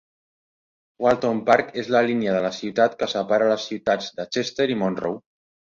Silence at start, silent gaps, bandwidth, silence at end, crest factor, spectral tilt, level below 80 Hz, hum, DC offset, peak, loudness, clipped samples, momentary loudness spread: 1 s; none; 7.6 kHz; 0.5 s; 20 dB; -5 dB/octave; -62 dBFS; none; under 0.1%; -2 dBFS; -22 LUFS; under 0.1%; 7 LU